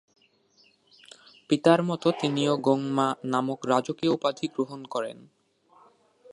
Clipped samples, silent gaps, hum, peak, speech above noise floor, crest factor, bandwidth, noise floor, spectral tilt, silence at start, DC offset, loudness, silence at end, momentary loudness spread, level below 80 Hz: under 0.1%; none; none; -4 dBFS; 38 dB; 24 dB; 11 kHz; -63 dBFS; -6 dB/octave; 1.5 s; under 0.1%; -26 LUFS; 1.2 s; 11 LU; -74 dBFS